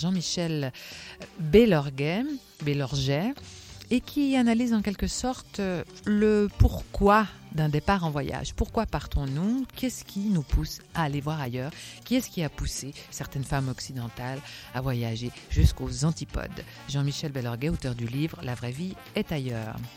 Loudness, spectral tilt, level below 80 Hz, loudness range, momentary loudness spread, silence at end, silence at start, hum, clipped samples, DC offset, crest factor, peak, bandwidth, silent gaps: -28 LUFS; -6 dB/octave; -38 dBFS; 6 LU; 12 LU; 0 s; 0 s; none; under 0.1%; under 0.1%; 22 dB; -6 dBFS; 16.5 kHz; none